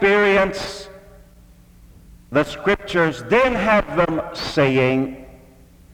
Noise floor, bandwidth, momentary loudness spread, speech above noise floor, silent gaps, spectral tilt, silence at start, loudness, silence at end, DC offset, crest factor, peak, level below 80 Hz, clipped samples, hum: -48 dBFS; 15.5 kHz; 13 LU; 29 dB; none; -5.5 dB/octave; 0 s; -19 LUFS; 0.6 s; under 0.1%; 16 dB; -4 dBFS; -42 dBFS; under 0.1%; none